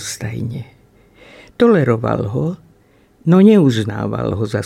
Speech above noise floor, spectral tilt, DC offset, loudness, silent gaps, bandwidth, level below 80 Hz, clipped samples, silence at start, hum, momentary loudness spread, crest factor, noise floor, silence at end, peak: 37 dB; -7 dB/octave; under 0.1%; -15 LUFS; none; 13.5 kHz; -48 dBFS; under 0.1%; 0 s; none; 15 LU; 16 dB; -52 dBFS; 0 s; -2 dBFS